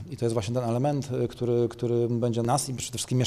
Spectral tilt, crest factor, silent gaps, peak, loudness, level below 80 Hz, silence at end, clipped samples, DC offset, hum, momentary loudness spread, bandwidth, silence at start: -6 dB/octave; 14 dB; none; -14 dBFS; -27 LUFS; -56 dBFS; 0 s; under 0.1%; under 0.1%; none; 4 LU; 13.5 kHz; 0 s